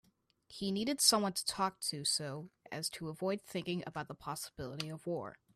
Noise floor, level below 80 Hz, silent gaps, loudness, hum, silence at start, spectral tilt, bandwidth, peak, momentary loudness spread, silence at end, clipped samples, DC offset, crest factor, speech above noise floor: -67 dBFS; -70 dBFS; none; -36 LUFS; none; 0.5 s; -3 dB/octave; 15.5 kHz; -12 dBFS; 16 LU; 0.25 s; under 0.1%; under 0.1%; 26 dB; 30 dB